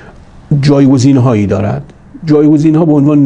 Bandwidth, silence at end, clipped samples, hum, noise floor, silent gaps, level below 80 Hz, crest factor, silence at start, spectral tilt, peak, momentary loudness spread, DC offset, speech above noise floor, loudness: 9.4 kHz; 0 s; 0.4%; none; -34 dBFS; none; -40 dBFS; 8 dB; 0.5 s; -8 dB/octave; 0 dBFS; 9 LU; under 0.1%; 27 dB; -9 LUFS